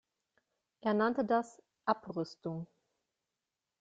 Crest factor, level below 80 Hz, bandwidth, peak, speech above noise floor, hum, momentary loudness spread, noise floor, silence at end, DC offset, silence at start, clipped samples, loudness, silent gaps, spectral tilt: 22 dB; -78 dBFS; 8 kHz; -16 dBFS; 56 dB; none; 14 LU; -90 dBFS; 1.15 s; under 0.1%; 0.85 s; under 0.1%; -35 LUFS; none; -7 dB/octave